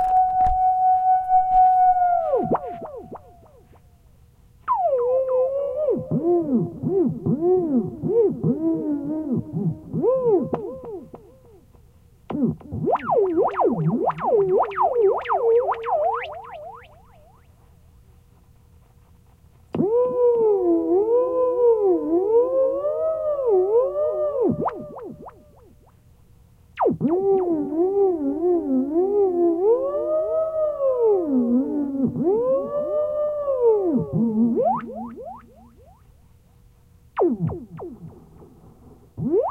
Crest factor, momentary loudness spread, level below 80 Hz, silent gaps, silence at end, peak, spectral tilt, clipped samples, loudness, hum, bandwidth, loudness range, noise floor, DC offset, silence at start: 14 dB; 15 LU; -48 dBFS; none; 0 s; -8 dBFS; -10.5 dB/octave; under 0.1%; -21 LUFS; none; 4 kHz; 7 LU; -53 dBFS; under 0.1%; 0 s